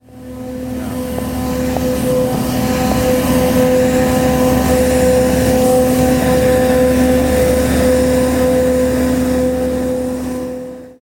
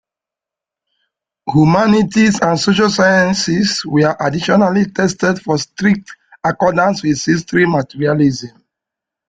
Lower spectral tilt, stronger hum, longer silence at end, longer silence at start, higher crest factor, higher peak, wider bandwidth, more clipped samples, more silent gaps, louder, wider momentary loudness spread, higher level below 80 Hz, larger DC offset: about the same, -5.5 dB/octave vs -5.5 dB/octave; neither; second, 0.1 s vs 0.8 s; second, 0.1 s vs 1.45 s; about the same, 14 dB vs 14 dB; about the same, 0 dBFS vs 0 dBFS; first, 17 kHz vs 9.4 kHz; neither; neither; about the same, -14 LUFS vs -14 LUFS; first, 10 LU vs 7 LU; first, -28 dBFS vs -48 dBFS; neither